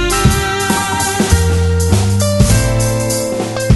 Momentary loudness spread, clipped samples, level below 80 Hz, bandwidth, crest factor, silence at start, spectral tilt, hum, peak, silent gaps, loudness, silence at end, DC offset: 4 LU; under 0.1%; -22 dBFS; 12.5 kHz; 12 dB; 0 s; -4.5 dB/octave; none; 0 dBFS; none; -13 LUFS; 0 s; under 0.1%